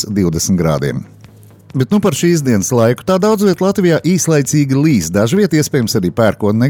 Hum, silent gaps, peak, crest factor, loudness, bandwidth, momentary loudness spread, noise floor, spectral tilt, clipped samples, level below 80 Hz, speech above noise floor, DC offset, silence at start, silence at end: none; none; -2 dBFS; 12 dB; -13 LUFS; 18.5 kHz; 3 LU; -40 dBFS; -5.5 dB/octave; under 0.1%; -42 dBFS; 27 dB; under 0.1%; 0 s; 0 s